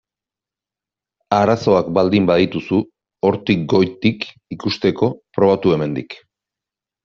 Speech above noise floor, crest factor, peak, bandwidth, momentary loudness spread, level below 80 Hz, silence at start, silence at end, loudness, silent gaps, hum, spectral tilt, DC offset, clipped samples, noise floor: 72 dB; 16 dB; -2 dBFS; 7.4 kHz; 13 LU; -54 dBFS; 1.3 s; 0.9 s; -17 LUFS; none; none; -5.5 dB/octave; under 0.1%; under 0.1%; -89 dBFS